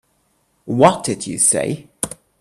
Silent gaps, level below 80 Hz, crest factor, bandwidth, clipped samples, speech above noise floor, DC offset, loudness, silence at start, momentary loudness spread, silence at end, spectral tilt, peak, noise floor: none; -54 dBFS; 20 dB; 14.5 kHz; under 0.1%; 47 dB; under 0.1%; -17 LUFS; 0.65 s; 12 LU; 0.3 s; -4 dB/octave; 0 dBFS; -63 dBFS